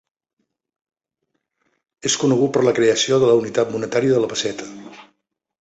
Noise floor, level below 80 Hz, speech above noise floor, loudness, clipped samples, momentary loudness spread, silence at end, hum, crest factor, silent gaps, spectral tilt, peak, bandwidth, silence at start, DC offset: -75 dBFS; -60 dBFS; 58 dB; -18 LUFS; under 0.1%; 11 LU; 0.6 s; none; 18 dB; none; -4 dB/octave; -4 dBFS; 8.2 kHz; 2.05 s; under 0.1%